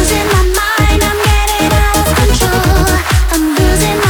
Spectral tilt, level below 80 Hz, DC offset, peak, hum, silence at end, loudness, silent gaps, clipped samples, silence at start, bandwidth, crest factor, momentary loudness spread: -4.5 dB/octave; -14 dBFS; under 0.1%; 0 dBFS; none; 0 s; -11 LUFS; none; under 0.1%; 0 s; over 20 kHz; 10 dB; 1 LU